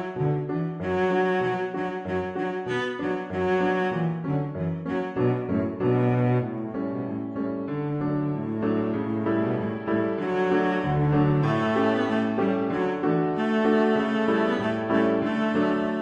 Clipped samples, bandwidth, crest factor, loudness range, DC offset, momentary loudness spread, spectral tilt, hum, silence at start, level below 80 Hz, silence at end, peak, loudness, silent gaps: under 0.1%; 8.2 kHz; 14 dB; 4 LU; under 0.1%; 7 LU; -8.5 dB/octave; none; 0 s; -56 dBFS; 0 s; -10 dBFS; -25 LUFS; none